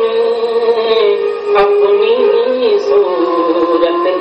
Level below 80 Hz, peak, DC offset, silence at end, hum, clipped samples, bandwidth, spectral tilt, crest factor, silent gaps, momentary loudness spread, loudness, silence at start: -52 dBFS; -2 dBFS; under 0.1%; 0 s; none; under 0.1%; 6.2 kHz; -5 dB/octave; 10 dB; none; 3 LU; -12 LUFS; 0 s